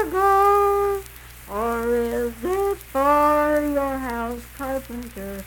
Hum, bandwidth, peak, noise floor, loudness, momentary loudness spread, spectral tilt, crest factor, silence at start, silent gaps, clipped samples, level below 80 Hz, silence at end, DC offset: none; 19 kHz; -6 dBFS; -41 dBFS; -21 LUFS; 15 LU; -5.5 dB/octave; 16 dB; 0 s; none; under 0.1%; -42 dBFS; 0 s; under 0.1%